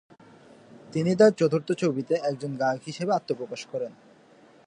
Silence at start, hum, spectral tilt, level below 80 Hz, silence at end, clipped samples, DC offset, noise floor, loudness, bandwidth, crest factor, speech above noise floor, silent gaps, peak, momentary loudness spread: 0.85 s; none; -6.5 dB/octave; -74 dBFS; 0.75 s; under 0.1%; under 0.1%; -55 dBFS; -26 LUFS; 10 kHz; 20 dB; 30 dB; none; -6 dBFS; 14 LU